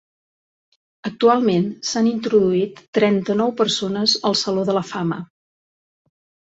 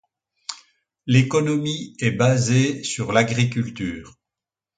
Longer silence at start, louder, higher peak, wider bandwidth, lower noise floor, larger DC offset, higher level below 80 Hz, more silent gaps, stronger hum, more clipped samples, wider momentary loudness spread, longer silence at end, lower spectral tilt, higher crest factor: first, 1.05 s vs 0.5 s; about the same, -19 LUFS vs -21 LUFS; about the same, -2 dBFS vs -2 dBFS; second, 8.2 kHz vs 9.4 kHz; about the same, under -90 dBFS vs -88 dBFS; neither; second, -62 dBFS vs -54 dBFS; first, 2.88-2.93 s vs none; neither; neither; second, 8 LU vs 17 LU; first, 1.35 s vs 0.7 s; about the same, -5 dB/octave vs -5.5 dB/octave; about the same, 18 dB vs 20 dB